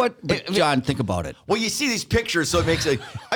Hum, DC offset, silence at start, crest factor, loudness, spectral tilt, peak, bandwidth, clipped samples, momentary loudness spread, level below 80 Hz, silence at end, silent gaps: none; under 0.1%; 0 s; 16 dB; -22 LUFS; -4 dB/octave; -6 dBFS; 19.5 kHz; under 0.1%; 6 LU; -44 dBFS; 0 s; none